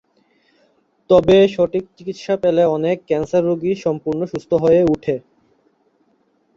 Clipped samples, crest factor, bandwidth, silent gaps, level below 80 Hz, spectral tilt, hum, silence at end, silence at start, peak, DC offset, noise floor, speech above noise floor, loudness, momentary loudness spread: under 0.1%; 16 dB; 7.6 kHz; none; -50 dBFS; -7.5 dB/octave; none; 1.35 s; 1.1 s; -2 dBFS; under 0.1%; -61 dBFS; 45 dB; -17 LUFS; 11 LU